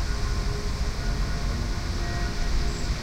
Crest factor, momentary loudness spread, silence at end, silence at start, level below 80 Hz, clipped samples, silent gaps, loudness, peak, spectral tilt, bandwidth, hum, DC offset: 12 dB; 1 LU; 0 s; 0 s; -28 dBFS; under 0.1%; none; -30 LUFS; -14 dBFS; -5 dB/octave; 15 kHz; none; under 0.1%